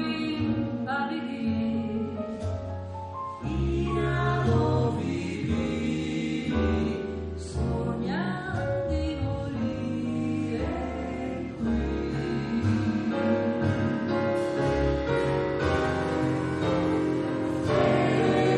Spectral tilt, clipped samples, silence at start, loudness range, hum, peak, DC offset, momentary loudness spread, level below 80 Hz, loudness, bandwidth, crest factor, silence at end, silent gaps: -7.5 dB/octave; under 0.1%; 0 s; 4 LU; none; -10 dBFS; under 0.1%; 8 LU; -40 dBFS; -28 LUFS; 10.5 kHz; 16 dB; 0 s; none